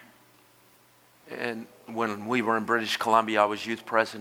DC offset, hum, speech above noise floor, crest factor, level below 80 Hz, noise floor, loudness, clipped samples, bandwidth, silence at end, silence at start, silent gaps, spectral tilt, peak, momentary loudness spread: under 0.1%; none; 33 dB; 22 dB; -78 dBFS; -59 dBFS; -27 LUFS; under 0.1%; over 20 kHz; 0 s; 1.25 s; none; -4 dB/octave; -6 dBFS; 12 LU